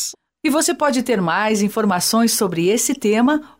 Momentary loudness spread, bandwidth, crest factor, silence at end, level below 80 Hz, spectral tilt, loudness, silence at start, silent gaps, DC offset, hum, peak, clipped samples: 3 LU; 16.5 kHz; 12 dB; 0.15 s; -60 dBFS; -3.5 dB/octave; -17 LUFS; 0 s; none; under 0.1%; none; -6 dBFS; under 0.1%